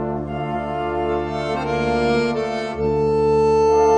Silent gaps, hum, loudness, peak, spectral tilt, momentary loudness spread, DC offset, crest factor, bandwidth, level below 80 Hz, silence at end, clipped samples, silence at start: none; none; -20 LUFS; -6 dBFS; -6.5 dB/octave; 9 LU; under 0.1%; 12 dB; 9.4 kHz; -38 dBFS; 0 s; under 0.1%; 0 s